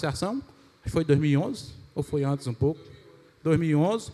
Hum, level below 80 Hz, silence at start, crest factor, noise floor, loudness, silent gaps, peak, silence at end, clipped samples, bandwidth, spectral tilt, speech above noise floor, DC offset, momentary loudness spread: none; -52 dBFS; 0 s; 18 dB; -53 dBFS; -27 LUFS; none; -10 dBFS; 0 s; under 0.1%; 12.5 kHz; -7 dB/octave; 28 dB; under 0.1%; 14 LU